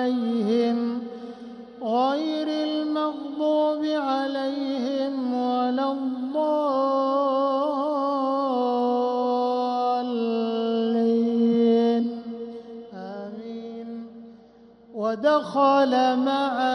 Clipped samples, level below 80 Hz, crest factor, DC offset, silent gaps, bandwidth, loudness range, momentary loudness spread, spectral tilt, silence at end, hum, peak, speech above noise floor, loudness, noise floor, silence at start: under 0.1%; -72 dBFS; 14 dB; under 0.1%; none; 9.6 kHz; 3 LU; 15 LU; -6 dB/octave; 0 s; none; -10 dBFS; 30 dB; -24 LUFS; -51 dBFS; 0 s